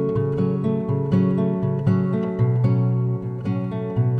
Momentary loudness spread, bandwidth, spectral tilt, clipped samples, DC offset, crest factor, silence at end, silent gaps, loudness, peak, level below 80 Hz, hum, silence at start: 6 LU; 4.7 kHz; -11 dB/octave; under 0.1%; under 0.1%; 14 dB; 0 s; none; -22 LUFS; -6 dBFS; -50 dBFS; none; 0 s